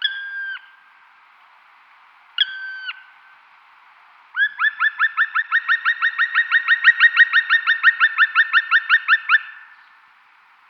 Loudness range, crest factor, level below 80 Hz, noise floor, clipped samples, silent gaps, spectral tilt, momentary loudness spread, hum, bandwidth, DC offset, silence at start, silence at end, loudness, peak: 15 LU; 18 dB; -86 dBFS; -53 dBFS; under 0.1%; none; 3.5 dB/octave; 17 LU; none; 6 kHz; under 0.1%; 0 s; 1.05 s; -16 LUFS; -2 dBFS